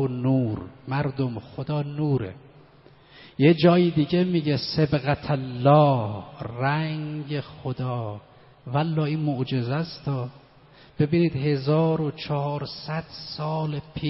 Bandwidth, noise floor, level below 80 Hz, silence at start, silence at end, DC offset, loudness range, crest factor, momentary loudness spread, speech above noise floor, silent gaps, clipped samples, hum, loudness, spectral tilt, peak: 5.8 kHz; -53 dBFS; -54 dBFS; 0 s; 0 s; under 0.1%; 7 LU; 20 dB; 14 LU; 29 dB; none; under 0.1%; none; -24 LUFS; -6.5 dB/octave; -4 dBFS